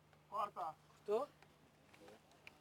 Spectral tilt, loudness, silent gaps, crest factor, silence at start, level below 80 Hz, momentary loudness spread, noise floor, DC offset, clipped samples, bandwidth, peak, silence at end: -5 dB/octave; -45 LUFS; none; 20 dB; 0.3 s; -84 dBFS; 22 LU; -69 dBFS; under 0.1%; under 0.1%; 18 kHz; -28 dBFS; 0.45 s